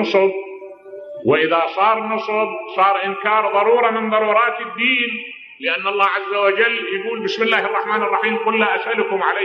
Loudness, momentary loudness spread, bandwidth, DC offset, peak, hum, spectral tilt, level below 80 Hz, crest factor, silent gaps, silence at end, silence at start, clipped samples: -17 LUFS; 9 LU; 6.8 kHz; under 0.1%; -2 dBFS; none; -5 dB/octave; -72 dBFS; 16 dB; none; 0 s; 0 s; under 0.1%